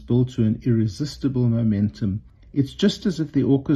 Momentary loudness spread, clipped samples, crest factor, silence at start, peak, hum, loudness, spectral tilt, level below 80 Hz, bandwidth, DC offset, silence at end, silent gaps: 7 LU; under 0.1%; 14 dB; 0 s; -6 dBFS; none; -22 LUFS; -7.5 dB/octave; -46 dBFS; 9 kHz; under 0.1%; 0 s; none